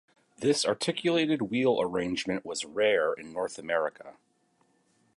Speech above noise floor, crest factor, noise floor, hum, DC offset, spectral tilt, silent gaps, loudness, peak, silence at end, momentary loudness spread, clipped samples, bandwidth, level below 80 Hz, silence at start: 41 dB; 18 dB; -70 dBFS; none; under 0.1%; -4 dB/octave; none; -29 LUFS; -12 dBFS; 1.05 s; 8 LU; under 0.1%; 11.5 kHz; -68 dBFS; 0.4 s